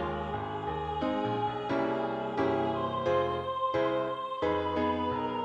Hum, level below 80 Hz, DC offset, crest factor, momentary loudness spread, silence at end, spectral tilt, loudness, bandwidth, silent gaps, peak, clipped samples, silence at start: none; -54 dBFS; under 0.1%; 14 dB; 5 LU; 0 s; -7.5 dB/octave; -31 LUFS; 8.2 kHz; none; -18 dBFS; under 0.1%; 0 s